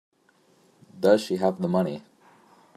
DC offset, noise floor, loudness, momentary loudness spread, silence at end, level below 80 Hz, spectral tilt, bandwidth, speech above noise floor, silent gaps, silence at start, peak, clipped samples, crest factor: under 0.1%; -63 dBFS; -24 LUFS; 9 LU; 0.75 s; -72 dBFS; -6.5 dB/octave; 15 kHz; 40 dB; none; 0.95 s; -6 dBFS; under 0.1%; 22 dB